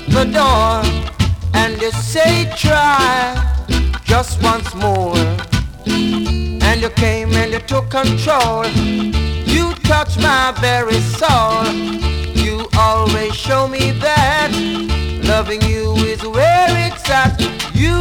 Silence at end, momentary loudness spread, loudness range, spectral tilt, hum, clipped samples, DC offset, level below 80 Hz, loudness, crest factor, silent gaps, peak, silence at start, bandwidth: 0 s; 6 LU; 2 LU; -5 dB/octave; none; under 0.1%; under 0.1%; -24 dBFS; -15 LUFS; 14 dB; none; 0 dBFS; 0 s; 18.5 kHz